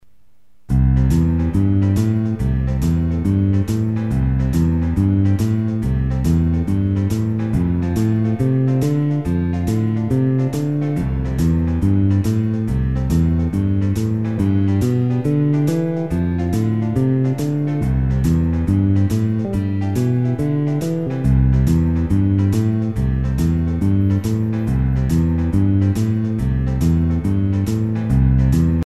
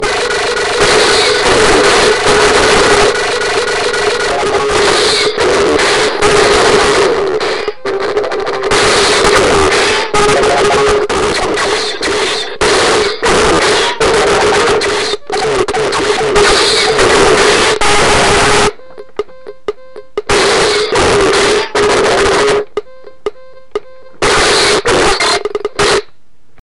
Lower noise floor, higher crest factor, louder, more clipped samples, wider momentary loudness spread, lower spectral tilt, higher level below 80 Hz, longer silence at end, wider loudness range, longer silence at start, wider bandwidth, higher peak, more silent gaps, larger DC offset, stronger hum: first, -61 dBFS vs -52 dBFS; about the same, 12 dB vs 10 dB; second, -18 LUFS vs -10 LUFS; neither; second, 4 LU vs 8 LU; first, -9 dB/octave vs -2.5 dB/octave; about the same, -26 dBFS vs -30 dBFS; about the same, 0 s vs 0 s; about the same, 1 LU vs 3 LU; first, 0.7 s vs 0 s; first, 13.5 kHz vs 12 kHz; second, -4 dBFS vs 0 dBFS; neither; first, 0.8% vs under 0.1%; neither